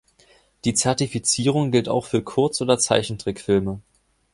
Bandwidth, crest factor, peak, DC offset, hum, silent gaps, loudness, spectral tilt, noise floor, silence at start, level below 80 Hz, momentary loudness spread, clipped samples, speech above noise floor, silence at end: 11.5 kHz; 20 dB; -2 dBFS; under 0.1%; none; none; -21 LUFS; -4 dB/octave; -57 dBFS; 0.65 s; -50 dBFS; 9 LU; under 0.1%; 36 dB; 0.55 s